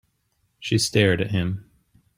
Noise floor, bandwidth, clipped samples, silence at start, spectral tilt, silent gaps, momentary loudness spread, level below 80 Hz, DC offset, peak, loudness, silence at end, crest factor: -70 dBFS; 16 kHz; under 0.1%; 0.6 s; -5 dB/octave; none; 15 LU; -54 dBFS; under 0.1%; -4 dBFS; -22 LUFS; 0.55 s; 22 dB